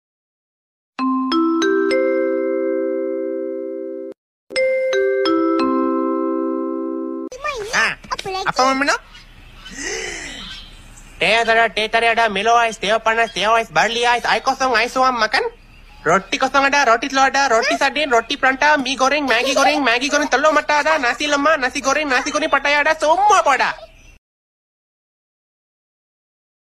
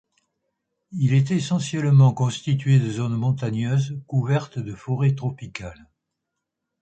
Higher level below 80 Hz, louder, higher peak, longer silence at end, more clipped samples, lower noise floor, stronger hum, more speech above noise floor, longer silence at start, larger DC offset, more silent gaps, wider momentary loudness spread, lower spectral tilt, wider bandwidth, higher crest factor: first, -48 dBFS vs -56 dBFS; first, -17 LUFS vs -22 LUFS; first, -2 dBFS vs -8 dBFS; first, 2.8 s vs 1.1 s; neither; second, -40 dBFS vs -81 dBFS; neither; second, 24 dB vs 60 dB; about the same, 1 s vs 0.9 s; neither; first, 4.18-4.47 s vs none; second, 11 LU vs 15 LU; second, -2.5 dB/octave vs -7 dB/octave; first, 15 kHz vs 8.8 kHz; about the same, 16 dB vs 16 dB